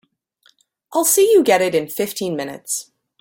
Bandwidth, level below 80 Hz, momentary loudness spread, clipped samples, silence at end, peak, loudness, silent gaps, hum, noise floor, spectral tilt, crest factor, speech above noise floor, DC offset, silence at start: 17 kHz; -66 dBFS; 12 LU; under 0.1%; 0.4 s; -2 dBFS; -17 LUFS; none; none; -59 dBFS; -3 dB/octave; 16 dB; 42 dB; under 0.1%; 0.9 s